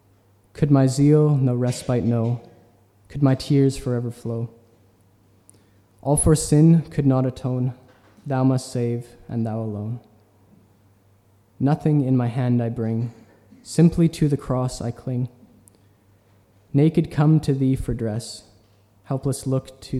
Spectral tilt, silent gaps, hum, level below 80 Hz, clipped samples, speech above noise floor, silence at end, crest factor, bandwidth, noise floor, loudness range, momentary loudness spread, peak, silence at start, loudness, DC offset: -7.5 dB/octave; none; none; -44 dBFS; under 0.1%; 37 dB; 0 s; 18 dB; 13.5 kHz; -57 dBFS; 6 LU; 14 LU; -4 dBFS; 0.55 s; -21 LUFS; under 0.1%